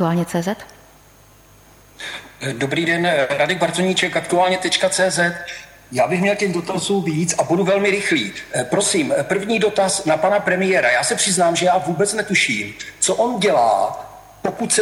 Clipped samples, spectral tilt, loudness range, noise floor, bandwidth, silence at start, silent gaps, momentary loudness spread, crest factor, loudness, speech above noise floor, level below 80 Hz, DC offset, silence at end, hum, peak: under 0.1%; -3.5 dB/octave; 4 LU; -48 dBFS; 16.5 kHz; 0 s; none; 11 LU; 14 dB; -18 LUFS; 30 dB; -56 dBFS; under 0.1%; 0 s; none; -4 dBFS